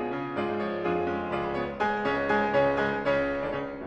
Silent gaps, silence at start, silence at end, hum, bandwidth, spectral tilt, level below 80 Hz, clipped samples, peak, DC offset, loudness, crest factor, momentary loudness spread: none; 0 s; 0 s; none; 8.4 kHz; -7 dB/octave; -52 dBFS; under 0.1%; -12 dBFS; under 0.1%; -28 LUFS; 16 dB; 6 LU